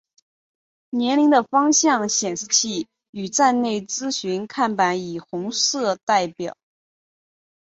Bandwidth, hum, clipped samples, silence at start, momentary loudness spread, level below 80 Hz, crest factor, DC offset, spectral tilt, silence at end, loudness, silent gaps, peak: 8 kHz; none; under 0.1%; 0.95 s; 13 LU; -68 dBFS; 18 dB; under 0.1%; -2.5 dB/octave; 1.15 s; -20 LUFS; 3.09-3.13 s, 6.03-6.07 s; -4 dBFS